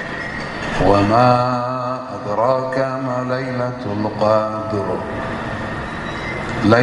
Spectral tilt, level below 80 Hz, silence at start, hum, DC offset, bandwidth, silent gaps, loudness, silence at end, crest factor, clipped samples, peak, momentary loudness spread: -7 dB/octave; -40 dBFS; 0 s; none; under 0.1%; 11.5 kHz; none; -19 LUFS; 0 s; 18 dB; under 0.1%; 0 dBFS; 11 LU